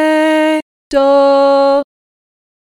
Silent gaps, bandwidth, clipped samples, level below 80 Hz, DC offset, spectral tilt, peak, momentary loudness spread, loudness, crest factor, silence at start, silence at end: 0.62-0.91 s; 11.5 kHz; under 0.1%; -50 dBFS; under 0.1%; -3 dB/octave; -2 dBFS; 9 LU; -11 LUFS; 10 dB; 0 s; 0.95 s